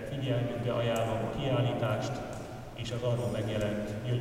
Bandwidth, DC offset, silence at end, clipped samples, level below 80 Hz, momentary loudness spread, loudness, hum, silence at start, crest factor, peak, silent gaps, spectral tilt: 15 kHz; under 0.1%; 0 s; under 0.1%; -52 dBFS; 9 LU; -32 LUFS; none; 0 s; 14 dB; -18 dBFS; none; -6.5 dB/octave